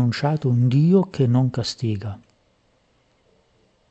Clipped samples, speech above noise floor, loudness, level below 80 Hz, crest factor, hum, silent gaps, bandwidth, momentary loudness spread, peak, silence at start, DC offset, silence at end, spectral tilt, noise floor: under 0.1%; 43 dB; -20 LUFS; -60 dBFS; 16 dB; none; none; 8.2 kHz; 13 LU; -6 dBFS; 0 s; under 0.1%; 1.75 s; -7.5 dB/octave; -63 dBFS